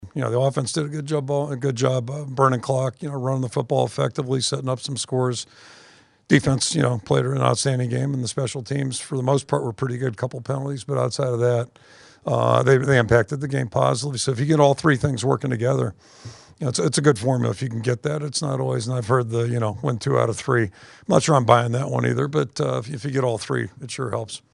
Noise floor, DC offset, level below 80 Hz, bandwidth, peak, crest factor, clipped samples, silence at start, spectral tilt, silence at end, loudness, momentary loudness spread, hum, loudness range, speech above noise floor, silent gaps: -51 dBFS; under 0.1%; -54 dBFS; 11.5 kHz; 0 dBFS; 22 dB; under 0.1%; 0 s; -5.5 dB/octave; 0.15 s; -22 LUFS; 10 LU; none; 4 LU; 29 dB; none